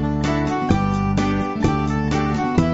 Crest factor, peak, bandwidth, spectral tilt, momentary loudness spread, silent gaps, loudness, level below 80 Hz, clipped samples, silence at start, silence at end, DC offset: 16 dB; -4 dBFS; 8 kHz; -7 dB/octave; 2 LU; none; -20 LUFS; -32 dBFS; under 0.1%; 0 s; 0 s; under 0.1%